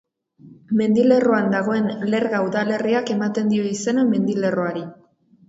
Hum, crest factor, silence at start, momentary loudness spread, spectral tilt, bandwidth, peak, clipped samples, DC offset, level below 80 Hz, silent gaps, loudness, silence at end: none; 16 dB; 0.45 s; 7 LU; -6 dB/octave; 8 kHz; -4 dBFS; under 0.1%; under 0.1%; -66 dBFS; none; -20 LUFS; 0.55 s